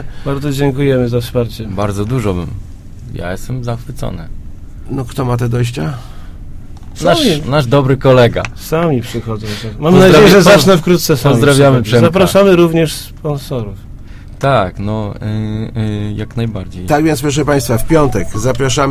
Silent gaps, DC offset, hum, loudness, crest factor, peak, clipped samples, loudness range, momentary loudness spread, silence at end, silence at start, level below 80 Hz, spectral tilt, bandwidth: none; under 0.1%; none; -12 LUFS; 12 dB; 0 dBFS; 0.4%; 12 LU; 15 LU; 0 s; 0 s; -30 dBFS; -6 dB/octave; 16 kHz